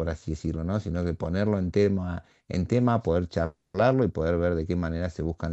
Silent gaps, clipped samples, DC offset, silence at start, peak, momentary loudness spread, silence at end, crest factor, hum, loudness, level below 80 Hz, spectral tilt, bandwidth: none; under 0.1%; under 0.1%; 0 s; -8 dBFS; 8 LU; 0 s; 18 dB; none; -27 LUFS; -42 dBFS; -8 dB/octave; 8.2 kHz